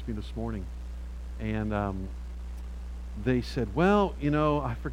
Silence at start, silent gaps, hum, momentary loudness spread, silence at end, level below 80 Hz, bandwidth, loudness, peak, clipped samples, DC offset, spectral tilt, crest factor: 0 s; none; none; 16 LU; 0 s; -38 dBFS; 11 kHz; -29 LUFS; -12 dBFS; under 0.1%; under 0.1%; -8 dB/octave; 18 dB